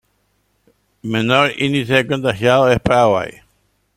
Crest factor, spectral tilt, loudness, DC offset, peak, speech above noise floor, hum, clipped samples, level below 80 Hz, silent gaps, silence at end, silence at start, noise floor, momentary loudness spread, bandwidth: 18 dB; -5.5 dB/octave; -15 LUFS; under 0.1%; 0 dBFS; 49 dB; none; under 0.1%; -44 dBFS; none; 0.65 s; 1.05 s; -64 dBFS; 8 LU; 16 kHz